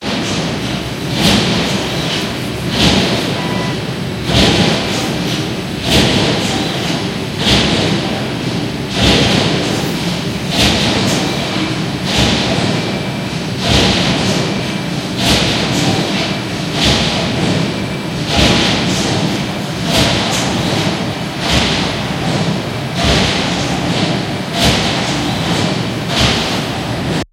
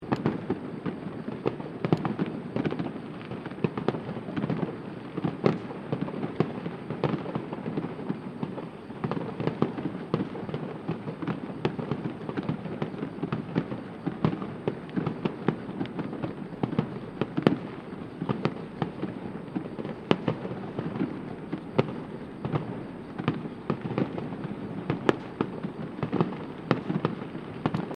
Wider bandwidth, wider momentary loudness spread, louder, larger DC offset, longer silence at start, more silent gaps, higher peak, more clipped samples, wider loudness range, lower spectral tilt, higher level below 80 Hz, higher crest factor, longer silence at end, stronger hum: first, 16.5 kHz vs 9.4 kHz; about the same, 8 LU vs 8 LU; first, -14 LUFS vs -32 LUFS; neither; about the same, 0 s vs 0 s; neither; about the same, 0 dBFS vs -2 dBFS; neither; about the same, 1 LU vs 2 LU; second, -4 dB/octave vs -8.5 dB/octave; first, -30 dBFS vs -62 dBFS; second, 14 dB vs 30 dB; about the same, 0.1 s vs 0 s; neither